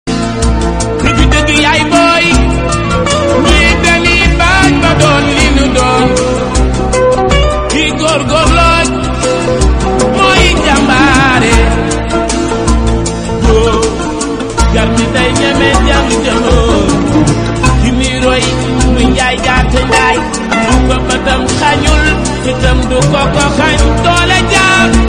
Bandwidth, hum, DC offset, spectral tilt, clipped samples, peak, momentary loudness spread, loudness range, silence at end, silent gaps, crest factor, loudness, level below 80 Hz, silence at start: 11 kHz; none; 0.3%; -4.5 dB/octave; 0.5%; 0 dBFS; 6 LU; 2 LU; 0 s; none; 8 dB; -9 LUFS; -16 dBFS; 0.05 s